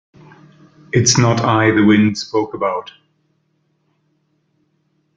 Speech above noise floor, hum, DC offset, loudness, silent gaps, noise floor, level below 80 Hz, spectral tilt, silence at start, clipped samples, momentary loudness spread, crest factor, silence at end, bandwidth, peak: 50 dB; none; under 0.1%; -15 LUFS; none; -64 dBFS; -52 dBFS; -4.5 dB/octave; 0.95 s; under 0.1%; 9 LU; 16 dB; 2.35 s; 9.4 kHz; -2 dBFS